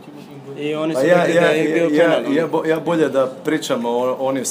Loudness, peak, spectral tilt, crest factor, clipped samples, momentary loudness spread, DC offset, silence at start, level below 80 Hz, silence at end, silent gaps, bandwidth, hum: -17 LUFS; 0 dBFS; -5 dB/octave; 18 dB; under 0.1%; 10 LU; under 0.1%; 0 s; -74 dBFS; 0 s; none; 15.5 kHz; none